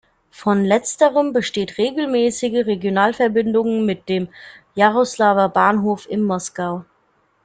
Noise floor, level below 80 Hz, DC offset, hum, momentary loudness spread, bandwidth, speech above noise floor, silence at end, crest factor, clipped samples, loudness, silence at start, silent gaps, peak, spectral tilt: -62 dBFS; -60 dBFS; under 0.1%; none; 9 LU; 9.4 kHz; 44 dB; 0.65 s; 18 dB; under 0.1%; -18 LUFS; 0.4 s; none; -2 dBFS; -5 dB/octave